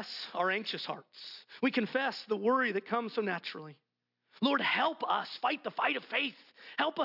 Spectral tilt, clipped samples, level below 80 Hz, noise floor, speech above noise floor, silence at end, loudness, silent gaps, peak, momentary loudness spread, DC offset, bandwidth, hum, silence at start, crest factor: -5.5 dB/octave; under 0.1%; -88 dBFS; -76 dBFS; 43 dB; 0 s; -33 LUFS; none; -16 dBFS; 14 LU; under 0.1%; 5.8 kHz; none; 0 s; 18 dB